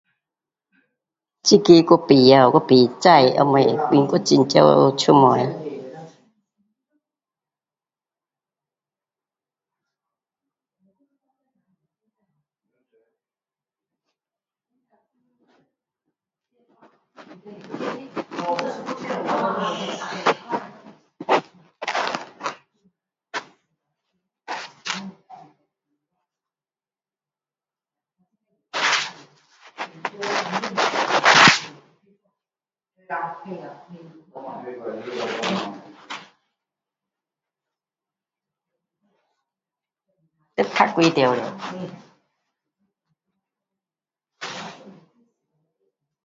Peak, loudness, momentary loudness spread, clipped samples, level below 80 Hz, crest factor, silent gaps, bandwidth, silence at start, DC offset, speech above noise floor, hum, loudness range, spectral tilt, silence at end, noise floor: 0 dBFS; -18 LUFS; 23 LU; under 0.1%; -66 dBFS; 24 dB; none; 7.8 kHz; 1.45 s; under 0.1%; over 75 dB; none; 23 LU; -4.5 dB/octave; 1.35 s; under -90 dBFS